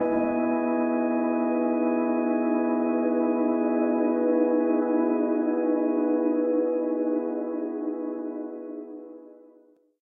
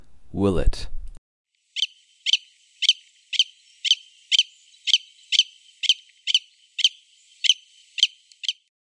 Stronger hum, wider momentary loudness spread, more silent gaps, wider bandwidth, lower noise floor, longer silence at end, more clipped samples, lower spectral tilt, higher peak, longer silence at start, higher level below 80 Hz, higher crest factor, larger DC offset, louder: neither; about the same, 10 LU vs 9 LU; second, none vs 1.18-1.45 s; second, 2.7 kHz vs 11 kHz; first, -59 dBFS vs -55 dBFS; first, 0.7 s vs 0.3 s; neither; first, -10.5 dB/octave vs -2 dB/octave; second, -12 dBFS vs -2 dBFS; about the same, 0 s vs 0.1 s; second, -72 dBFS vs -36 dBFS; second, 14 dB vs 24 dB; neither; second, -25 LUFS vs -22 LUFS